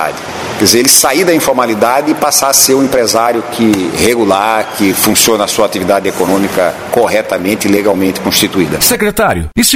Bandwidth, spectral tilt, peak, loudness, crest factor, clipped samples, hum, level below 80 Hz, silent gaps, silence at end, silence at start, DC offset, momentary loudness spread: over 20 kHz; -2.5 dB/octave; 0 dBFS; -10 LUFS; 10 dB; 0.6%; none; -38 dBFS; none; 0 s; 0 s; under 0.1%; 6 LU